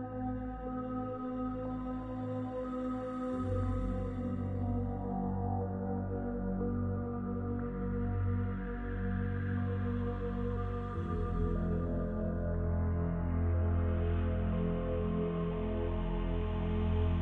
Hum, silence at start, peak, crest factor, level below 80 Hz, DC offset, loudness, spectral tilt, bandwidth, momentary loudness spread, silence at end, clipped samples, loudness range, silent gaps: none; 0 s; -22 dBFS; 12 dB; -40 dBFS; under 0.1%; -36 LUFS; -10.5 dB/octave; 3.9 kHz; 5 LU; 0 s; under 0.1%; 3 LU; none